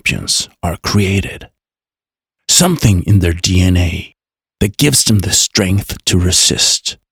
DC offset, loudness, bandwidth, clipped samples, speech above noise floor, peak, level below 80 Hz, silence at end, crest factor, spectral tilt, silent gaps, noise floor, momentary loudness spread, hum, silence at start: under 0.1%; -12 LUFS; over 20 kHz; under 0.1%; over 77 dB; 0 dBFS; -34 dBFS; 0.2 s; 14 dB; -3.5 dB/octave; none; under -90 dBFS; 10 LU; none; 0.05 s